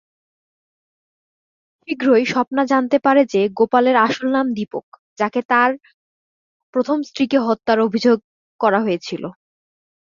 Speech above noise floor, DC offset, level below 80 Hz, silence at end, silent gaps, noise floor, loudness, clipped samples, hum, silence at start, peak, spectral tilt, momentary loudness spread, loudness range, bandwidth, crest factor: over 73 dB; under 0.1%; -64 dBFS; 0.8 s; 2.47-2.51 s, 4.83-4.92 s, 4.99-5.16 s, 5.45-5.49 s, 5.94-6.73 s, 8.24-8.59 s; under -90 dBFS; -18 LUFS; under 0.1%; none; 1.9 s; -2 dBFS; -5.5 dB/octave; 11 LU; 4 LU; 7.4 kHz; 18 dB